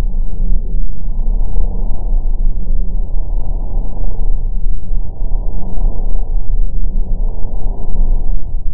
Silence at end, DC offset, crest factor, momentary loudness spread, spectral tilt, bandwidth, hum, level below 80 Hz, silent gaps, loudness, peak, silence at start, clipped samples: 0 s; under 0.1%; 8 dB; 4 LU; -14 dB/octave; 1.1 kHz; none; -14 dBFS; none; -23 LUFS; 0 dBFS; 0 s; 0.4%